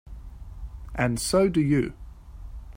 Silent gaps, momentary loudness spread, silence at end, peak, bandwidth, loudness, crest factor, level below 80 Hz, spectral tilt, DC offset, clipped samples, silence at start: none; 24 LU; 0 s; -10 dBFS; 16 kHz; -24 LUFS; 18 dB; -40 dBFS; -5.5 dB/octave; under 0.1%; under 0.1%; 0.05 s